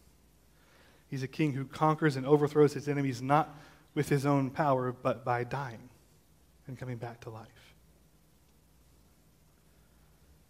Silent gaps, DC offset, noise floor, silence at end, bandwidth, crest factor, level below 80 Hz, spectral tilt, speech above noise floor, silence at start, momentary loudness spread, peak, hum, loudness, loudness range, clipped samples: none; under 0.1%; -65 dBFS; 3.05 s; 16 kHz; 22 dB; -66 dBFS; -7 dB/octave; 34 dB; 1.1 s; 17 LU; -10 dBFS; none; -31 LUFS; 19 LU; under 0.1%